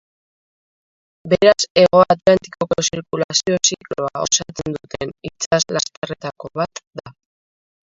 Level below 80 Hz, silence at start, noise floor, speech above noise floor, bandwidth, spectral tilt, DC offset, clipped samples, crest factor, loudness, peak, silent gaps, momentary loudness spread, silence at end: -52 dBFS; 1.25 s; under -90 dBFS; over 72 dB; 7.8 kHz; -3 dB/octave; under 0.1%; under 0.1%; 20 dB; -18 LUFS; 0 dBFS; 1.70-1.75 s, 3.24-3.29 s, 5.46-5.51 s, 5.97-6.02 s, 6.87-6.91 s; 15 LU; 0.8 s